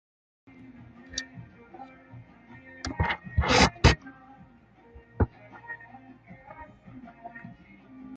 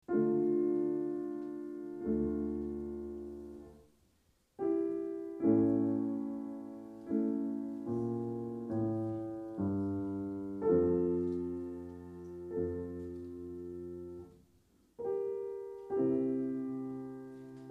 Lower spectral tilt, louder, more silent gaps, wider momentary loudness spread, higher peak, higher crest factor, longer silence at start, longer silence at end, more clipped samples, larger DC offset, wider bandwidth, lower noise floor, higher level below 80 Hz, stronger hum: second, -4.5 dB/octave vs -11 dB/octave; first, -26 LUFS vs -36 LUFS; neither; first, 28 LU vs 16 LU; first, -4 dBFS vs -18 dBFS; first, 26 dB vs 18 dB; first, 1.1 s vs 0.1 s; about the same, 0 s vs 0 s; neither; neither; first, 9.2 kHz vs 2.8 kHz; second, -56 dBFS vs -72 dBFS; first, -38 dBFS vs -62 dBFS; neither